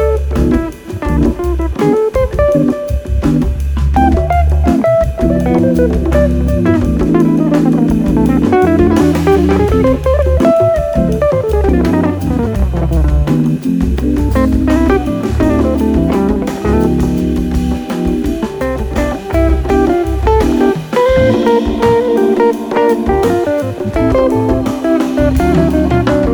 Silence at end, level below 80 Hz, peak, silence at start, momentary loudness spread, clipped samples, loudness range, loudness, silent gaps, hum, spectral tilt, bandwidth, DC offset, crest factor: 0 s; -18 dBFS; 0 dBFS; 0 s; 6 LU; under 0.1%; 3 LU; -12 LUFS; none; none; -8 dB/octave; 19.5 kHz; under 0.1%; 10 dB